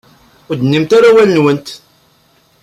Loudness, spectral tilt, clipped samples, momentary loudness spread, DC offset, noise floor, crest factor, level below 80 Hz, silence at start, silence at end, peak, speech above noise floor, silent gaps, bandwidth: -10 LUFS; -6.5 dB/octave; under 0.1%; 15 LU; under 0.1%; -52 dBFS; 12 dB; -54 dBFS; 0.5 s; 0.85 s; -2 dBFS; 42 dB; none; 13.5 kHz